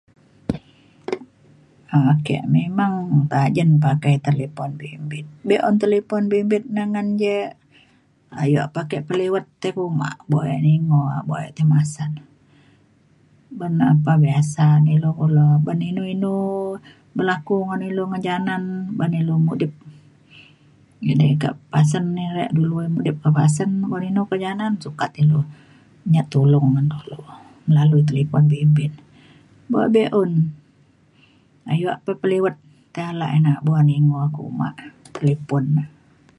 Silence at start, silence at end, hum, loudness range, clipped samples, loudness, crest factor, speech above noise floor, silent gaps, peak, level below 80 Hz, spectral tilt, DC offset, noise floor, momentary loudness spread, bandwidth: 0.5 s; 0.5 s; none; 5 LU; under 0.1%; -20 LUFS; 16 dB; 38 dB; none; -4 dBFS; -58 dBFS; -8 dB/octave; under 0.1%; -57 dBFS; 14 LU; 11 kHz